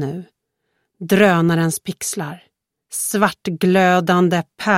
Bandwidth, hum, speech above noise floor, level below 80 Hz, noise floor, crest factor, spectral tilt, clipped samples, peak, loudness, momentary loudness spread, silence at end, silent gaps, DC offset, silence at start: 16 kHz; none; 55 dB; -60 dBFS; -72 dBFS; 18 dB; -5 dB/octave; under 0.1%; 0 dBFS; -17 LUFS; 14 LU; 0 s; none; under 0.1%; 0 s